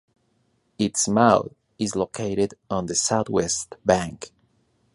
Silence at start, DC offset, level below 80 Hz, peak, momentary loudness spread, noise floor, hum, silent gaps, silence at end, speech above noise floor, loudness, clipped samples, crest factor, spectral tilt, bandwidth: 0.8 s; under 0.1%; -52 dBFS; -2 dBFS; 13 LU; -68 dBFS; none; none; 0.65 s; 45 dB; -23 LUFS; under 0.1%; 22 dB; -4 dB/octave; 11.5 kHz